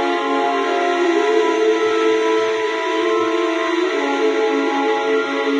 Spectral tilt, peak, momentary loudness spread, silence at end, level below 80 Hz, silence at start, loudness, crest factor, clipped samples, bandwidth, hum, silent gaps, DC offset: -2.5 dB/octave; -4 dBFS; 3 LU; 0 s; -78 dBFS; 0 s; -18 LUFS; 12 dB; under 0.1%; 9.6 kHz; none; none; under 0.1%